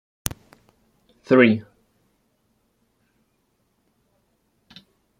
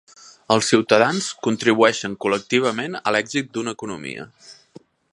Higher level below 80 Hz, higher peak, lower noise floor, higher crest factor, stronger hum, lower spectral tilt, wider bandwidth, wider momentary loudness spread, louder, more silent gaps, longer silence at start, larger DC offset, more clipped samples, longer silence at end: first, -56 dBFS vs -64 dBFS; about the same, -2 dBFS vs 0 dBFS; first, -69 dBFS vs -49 dBFS; first, 26 dB vs 20 dB; neither; first, -5.5 dB/octave vs -4 dB/octave; first, 16.5 kHz vs 11.5 kHz; about the same, 16 LU vs 14 LU; about the same, -19 LUFS vs -20 LUFS; neither; first, 1.3 s vs 0.25 s; neither; neither; first, 3.6 s vs 0.6 s